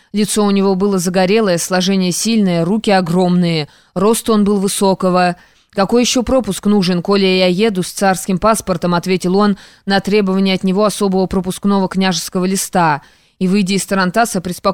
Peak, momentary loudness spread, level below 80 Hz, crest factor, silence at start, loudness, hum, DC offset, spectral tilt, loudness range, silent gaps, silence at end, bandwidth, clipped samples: -2 dBFS; 4 LU; -42 dBFS; 12 dB; 0.15 s; -14 LUFS; none; 0.6%; -5 dB/octave; 2 LU; none; 0 s; 17 kHz; under 0.1%